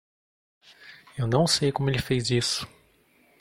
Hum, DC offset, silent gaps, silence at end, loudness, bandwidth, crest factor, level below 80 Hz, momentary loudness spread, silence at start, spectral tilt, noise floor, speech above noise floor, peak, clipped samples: none; under 0.1%; none; 0.75 s; -25 LUFS; 16.5 kHz; 20 dB; -52 dBFS; 12 LU; 0.8 s; -4.5 dB/octave; -62 dBFS; 37 dB; -8 dBFS; under 0.1%